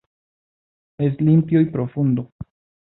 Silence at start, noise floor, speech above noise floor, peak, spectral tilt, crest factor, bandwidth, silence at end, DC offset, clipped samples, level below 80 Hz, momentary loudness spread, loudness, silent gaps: 1 s; under -90 dBFS; over 72 dB; -6 dBFS; -14 dB/octave; 16 dB; 4 kHz; 0.5 s; under 0.1%; under 0.1%; -54 dBFS; 21 LU; -19 LUFS; 2.32-2.39 s